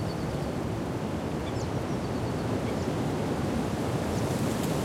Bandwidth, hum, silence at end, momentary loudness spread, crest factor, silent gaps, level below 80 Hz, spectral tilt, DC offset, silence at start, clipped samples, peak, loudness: 16.5 kHz; none; 0 s; 3 LU; 14 dB; none; -46 dBFS; -6.5 dB/octave; under 0.1%; 0 s; under 0.1%; -16 dBFS; -31 LUFS